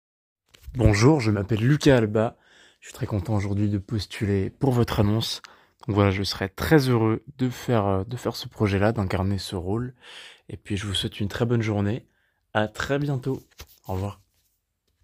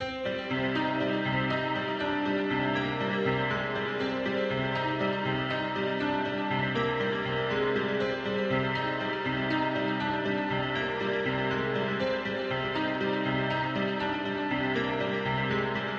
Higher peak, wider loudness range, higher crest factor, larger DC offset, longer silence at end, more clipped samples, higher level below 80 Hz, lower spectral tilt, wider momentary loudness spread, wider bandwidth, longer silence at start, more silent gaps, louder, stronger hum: first, -4 dBFS vs -16 dBFS; first, 5 LU vs 1 LU; first, 20 dB vs 14 dB; neither; first, 0.9 s vs 0 s; neither; first, -44 dBFS vs -56 dBFS; about the same, -6.5 dB/octave vs -7 dB/octave; first, 15 LU vs 2 LU; first, 16 kHz vs 7.6 kHz; first, 0.65 s vs 0 s; neither; first, -24 LUFS vs -29 LUFS; neither